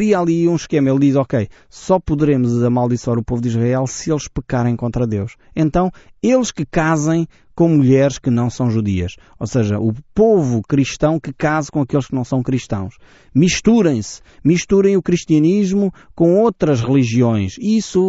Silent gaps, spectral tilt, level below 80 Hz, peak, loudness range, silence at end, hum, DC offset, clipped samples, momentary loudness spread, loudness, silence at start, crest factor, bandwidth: none; -7.5 dB/octave; -40 dBFS; -2 dBFS; 3 LU; 0 s; none; under 0.1%; under 0.1%; 8 LU; -17 LUFS; 0 s; 14 dB; 8 kHz